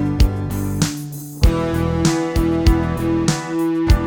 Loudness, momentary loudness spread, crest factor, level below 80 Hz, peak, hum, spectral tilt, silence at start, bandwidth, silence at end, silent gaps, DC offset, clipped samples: -19 LUFS; 5 LU; 16 dB; -22 dBFS; -2 dBFS; none; -6 dB/octave; 0 s; 20 kHz; 0 s; none; under 0.1%; under 0.1%